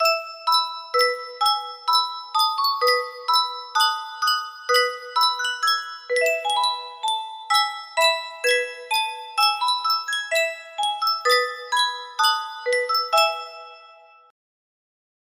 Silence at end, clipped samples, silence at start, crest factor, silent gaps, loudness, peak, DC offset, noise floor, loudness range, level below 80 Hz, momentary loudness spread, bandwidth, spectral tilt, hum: 1.35 s; under 0.1%; 0 s; 18 dB; none; -21 LUFS; -6 dBFS; under 0.1%; -49 dBFS; 1 LU; -76 dBFS; 6 LU; 16 kHz; 3.5 dB/octave; none